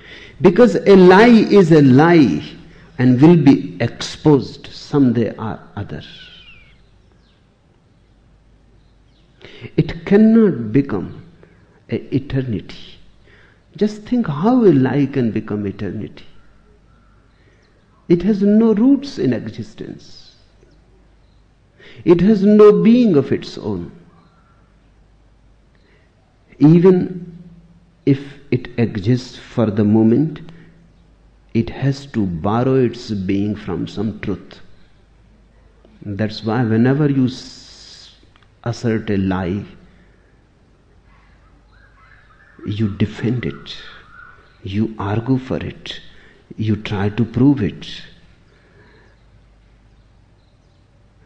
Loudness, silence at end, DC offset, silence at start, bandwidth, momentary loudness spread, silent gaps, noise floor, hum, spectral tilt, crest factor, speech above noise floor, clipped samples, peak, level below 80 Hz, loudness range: -15 LUFS; 3.2 s; under 0.1%; 0.1 s; 8.4 kHz; 23 LU; none; -54 dBFS; none; -8 dB/octave; 16 dB; 39 dB; under 0.1%; -2 dBFS; -46 dBFS; 11 LU